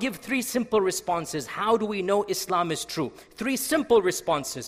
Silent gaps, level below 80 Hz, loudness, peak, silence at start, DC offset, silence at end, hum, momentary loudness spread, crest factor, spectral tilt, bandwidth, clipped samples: none; -60 dBFS; -26 LUFS; -8 dBFS; 0 s; under 0.1%; 0 s; none; 9 LU; 18 dB; -3.5 dB/octave; 16 kHz; under 0.1%